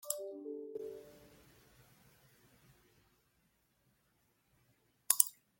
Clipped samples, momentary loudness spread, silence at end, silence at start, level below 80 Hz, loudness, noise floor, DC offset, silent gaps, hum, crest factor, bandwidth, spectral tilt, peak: under 0.1%; 19 LU; 0.25 s; 0.05 s; -80 dBFS; -35 LUFS; -77 dBFS; under 0.1%; none; none; 38 dB; 16.5 kHz; -0.5 dB/octave; -6 dBFS